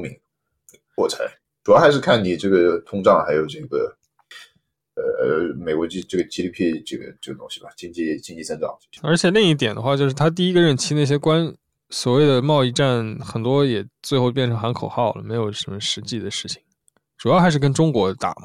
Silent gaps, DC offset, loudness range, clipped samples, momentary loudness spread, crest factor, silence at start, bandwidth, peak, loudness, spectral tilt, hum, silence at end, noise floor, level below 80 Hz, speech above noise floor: none; under 0.1%; 7 LU; under 0.1%; 14 LU; 16 dB; 0 s; 13.5 kHz; -4 dBFS; -20 LUFS; -5.5 dB/octave; none; 0.1 s; -74 dBFS; -56 dBFS; 55 dB